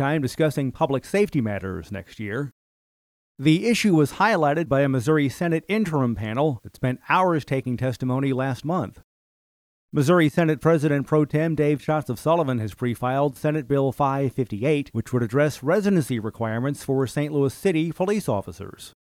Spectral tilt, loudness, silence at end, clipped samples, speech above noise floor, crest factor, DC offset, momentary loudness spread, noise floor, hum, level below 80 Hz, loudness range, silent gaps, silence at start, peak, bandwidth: -7 dB/octave; -23 LUFS; 0.1 s; under 0.1%; over 68 dB; 16 dB; under 0.1%; 8 LU; under -90 dBFS; none; -54 dBFS; 3 LU; 2.52-3.35 s, 9.04-9.89 s; 0 s; -6 dBFS; 16 kHz